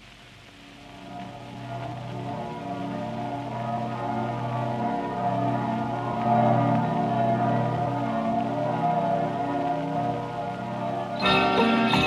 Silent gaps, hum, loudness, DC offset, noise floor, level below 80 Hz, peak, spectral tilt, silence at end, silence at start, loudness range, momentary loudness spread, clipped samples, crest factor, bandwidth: none; none; -26 LUFS; under 0.1%; -48 dBFS; -56 dBFS; -10 dBFS; -7 dB/octave; 0 s; 0 s; 9 LU; 15 LU; under 0.1%; 18 dB; 12 kHz